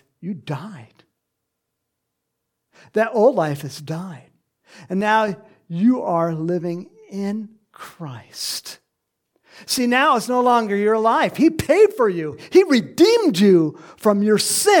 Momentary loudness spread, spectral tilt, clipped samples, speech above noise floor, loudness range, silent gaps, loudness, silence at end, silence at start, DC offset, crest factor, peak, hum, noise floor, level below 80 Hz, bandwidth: 17 LU; -4.5 dB/octave; under 0.1%; 60 dB; 10 LU; none; -18 LUFS; 0 s; 0.25 s; under 0.1%; 18 dB; -2 dBFS; none; -78 dBFS; -58 dBFS; 17.5 kHz